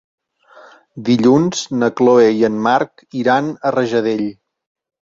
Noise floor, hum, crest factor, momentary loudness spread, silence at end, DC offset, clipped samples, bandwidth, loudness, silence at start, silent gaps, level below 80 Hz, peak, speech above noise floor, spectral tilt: -45 dBFS; none; 14 dB; 10 LU; 0.7 s; under 0.1%; under 0.1%; 7.8 kHz; -15 LUFS; 0.95 s; none; -58 dBFS; -2 dBFS; 31 dB; -5.5 dB/octave